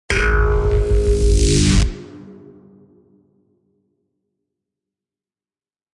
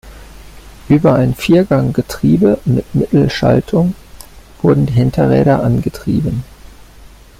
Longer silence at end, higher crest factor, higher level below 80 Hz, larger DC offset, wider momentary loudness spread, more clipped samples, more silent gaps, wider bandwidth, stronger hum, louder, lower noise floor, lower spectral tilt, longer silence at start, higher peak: first, 3.6 s vs 0.35 s; about the same, 16 dB vs 12 dB; first, -22 dBFS vs -36 dBFS; neither; first, 20 LU vs 6 LU; neither; neither; second, 11.5 kHz vs 15.5 kHz; neither; second, -17 LUFS vs -13 LUFS; first, under -90 dBFS vs -38 dBFS; second, -5 dB/octave vs -8 dB/octave; about the same, 0.1 s vs 0.05 s; about the same, -2 dBFS vs -2 dBFS